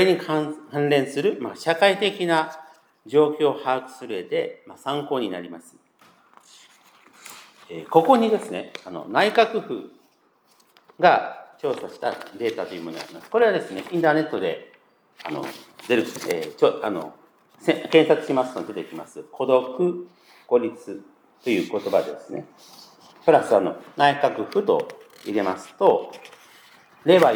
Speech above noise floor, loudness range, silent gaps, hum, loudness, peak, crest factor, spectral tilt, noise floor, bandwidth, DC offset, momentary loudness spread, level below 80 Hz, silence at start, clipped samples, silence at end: 39 dB; 5 LU; none; none; -23 LUFS; -2 dBFS; 22 dB; -5.5 dB/octave; -62 dBFS; over 20 kHz; under 0.1%; 18 LU; -80 dBFS; 0 s; under 0.1%; 0 s